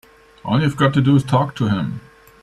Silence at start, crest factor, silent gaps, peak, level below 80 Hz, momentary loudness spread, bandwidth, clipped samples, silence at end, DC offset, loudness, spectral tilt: 0.45 s; 16 dB; none; -2 dBFS; -50 dBFS; 14 LU; 12 kHz; under 0.1%; 0.45 s; under 0.1%; -18 LUFS; -7.5 dB/octave